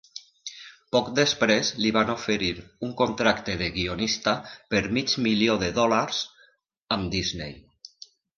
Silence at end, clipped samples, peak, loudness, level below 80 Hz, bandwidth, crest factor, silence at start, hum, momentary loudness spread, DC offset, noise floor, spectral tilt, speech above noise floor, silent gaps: 0.5 s; under 0.1%; -4 dBFS; -25 LUFS; -50 dBFS; 7.4 kHz; 22 dB; 0.15 s; none; 17 LU; under 0.1%; -62 dBFS; -4 dB/octave; 37 dB; 6.81-6.87 s